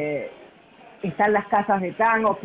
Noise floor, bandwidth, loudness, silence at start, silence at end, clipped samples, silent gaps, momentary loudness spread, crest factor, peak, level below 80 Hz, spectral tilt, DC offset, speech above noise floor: -49 dBFS; 4 kHz; -22 LUFS; 0 s; 0 s; under 0.1%; none; 13 LU; 16 dB; -8 dBFS; -64 dBFS; -10 dB/octave; under 0.1%; 28 dB